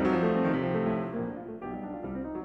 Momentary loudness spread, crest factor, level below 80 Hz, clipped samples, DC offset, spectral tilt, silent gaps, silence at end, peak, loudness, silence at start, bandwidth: 12 LU; 14 dB; -54 dBFS; under 0.1%; under 0.1%; -9 dB/octave; none; 0 s; -14 dBFS; -31 LUFS; 0 s; 6.2 kHz